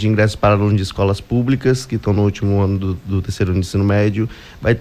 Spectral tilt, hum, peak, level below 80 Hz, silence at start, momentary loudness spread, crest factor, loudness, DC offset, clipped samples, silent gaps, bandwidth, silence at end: -7 dB/octave; none; -4 dBFS; -32 dBFS; 0 s; 7 LU; 14 dB; -17 LUFS; under 0.1%; under 0.1%; none; 13.5 kHz; 0 s